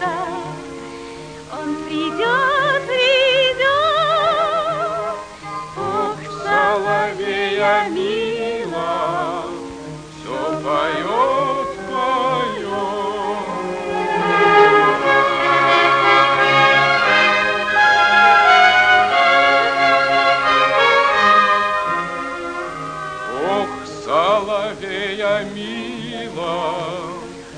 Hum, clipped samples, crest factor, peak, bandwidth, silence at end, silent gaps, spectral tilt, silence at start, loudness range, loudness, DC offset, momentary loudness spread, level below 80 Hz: none; under 0.1%; 18 dB; 0 dBFS; 10 kHz; 0 s; none; -3.5 dB/octave; 0 s; 9 LU; -16 LUFS; under 0.1%; 15 LU; -52 dBFS